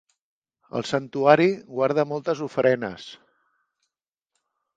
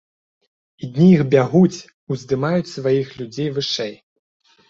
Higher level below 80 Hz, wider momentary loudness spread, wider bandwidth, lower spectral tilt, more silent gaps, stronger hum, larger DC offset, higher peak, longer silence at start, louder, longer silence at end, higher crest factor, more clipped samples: second, -68 dBFS vs -58 dBFS; about the same, 15 LU vs 15 LU; first, 9.2 kHz vs 7.6 kHz; about the same, -6 dB/octave vs -7 dB/octave; second, none vs 1.94-2.07 s; neither; neither; about the same, -2 dBFS vs -2 dBFS; about the same, 0.75 s vs 0.8 s; second, -23 LUFS vs -18 LUFS; first, 1.6 s vs 0.75 s; first, 24 dB vs 18 dB; neither